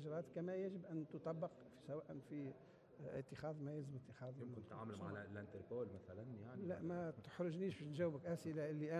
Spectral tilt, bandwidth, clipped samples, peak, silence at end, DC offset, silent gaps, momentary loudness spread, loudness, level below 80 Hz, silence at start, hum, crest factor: -8 dB/octave; 12.5 kHz; under 0.1%; -32 dBFS; 0 s; under 0.1%; none; 10 LU; -49 LUFS; -76 dBFS; 0 s; none; 16 dB